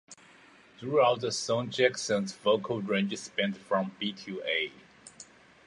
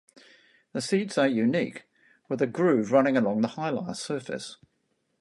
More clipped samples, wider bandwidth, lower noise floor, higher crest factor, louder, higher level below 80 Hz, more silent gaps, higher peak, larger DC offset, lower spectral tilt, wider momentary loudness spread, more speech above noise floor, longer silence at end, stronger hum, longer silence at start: neither; about the same, 11.5 kHz vs 11.5 kHz; second, -57 dBFS vs -74 dBFS; about the same, 20 dB vs 20 dB; second, -30 LUFS vs -27 LUFS; about the same, -74 dBFS vs -74 dBFS; neither; about the same, -10 dBFS vs -8 dBFS; neither; second, -4 dB/octave vs -5.5 dB/octave; about the same, 14 LU vs 14 LU; second, 27 dB vs 49 dB; second, 0.45 s vs 0.65 s; neither; second, 0.1 s vs 0.75 s